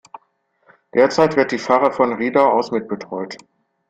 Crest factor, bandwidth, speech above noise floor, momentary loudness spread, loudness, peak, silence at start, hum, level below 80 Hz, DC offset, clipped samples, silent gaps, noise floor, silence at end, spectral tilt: 18 dB; 9 kHz; 47 dB; 14 LU; -18 LUFS; -2 dBFS; 0.95 s; none; -60 dBFS; under 0.1%; under 0.1%; none; -64 dBFS; 0.5 s; -5.5 dB/octave